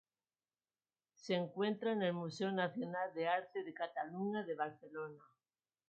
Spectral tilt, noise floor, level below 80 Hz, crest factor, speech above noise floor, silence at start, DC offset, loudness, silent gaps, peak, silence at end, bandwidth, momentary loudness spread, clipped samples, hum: -4 dB/octave; under -90 dBFS; under -90 dBFS; 20 dB; over 50 dB; 1.25 s; under 0.1%; -40 LUFS; none; -22 dBFS; 0.7 s; 7.4 kHz; 11 LU; under 0.1%; none